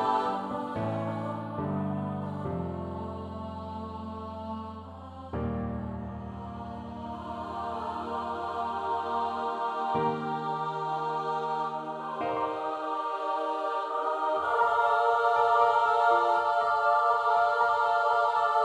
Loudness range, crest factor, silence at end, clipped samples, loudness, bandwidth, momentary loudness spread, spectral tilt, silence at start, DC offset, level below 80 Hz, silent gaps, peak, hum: 13 LU; 18 dB; 0 s; under 0.1%; -29 LUFS; 11 kHz; 14 LU; -7 dB/octave; 0 s; under 0.1%; -54 dBFS; none; -12 dBFS; none